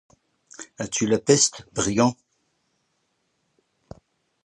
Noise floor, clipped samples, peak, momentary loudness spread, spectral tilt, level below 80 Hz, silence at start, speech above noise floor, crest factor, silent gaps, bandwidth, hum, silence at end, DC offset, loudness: -72 dBFS; under 0.1%; -2 dBFS; 18 LU; -3.5 dB/octave; -56 dBFS; 0.6 s; 50 dB; 24 dB; none; 11.5 kHz; none; 2.35 s; under 0.1%; -22 LUFS